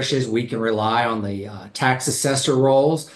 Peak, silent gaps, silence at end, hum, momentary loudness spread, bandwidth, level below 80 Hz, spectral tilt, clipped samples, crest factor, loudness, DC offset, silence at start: -4 dBFS; none; 0 s; none; 11 LU; 12.5 kHz; -56 dBFS; -4.5 dB/octave; under 0.1%; 16 dB; -20 LUFS; under 0.1%; 0 s